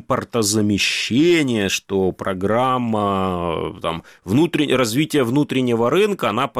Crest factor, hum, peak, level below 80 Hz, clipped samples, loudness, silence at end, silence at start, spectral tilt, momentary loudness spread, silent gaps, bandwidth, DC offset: 14 dB; none; -4 dBFS; -50 dBFS; under 0.1%; -19 LUFS; 0 s; 0.1 s; -4.5 dB/octave; 7 LU; none; 16 kHz; under 0.1%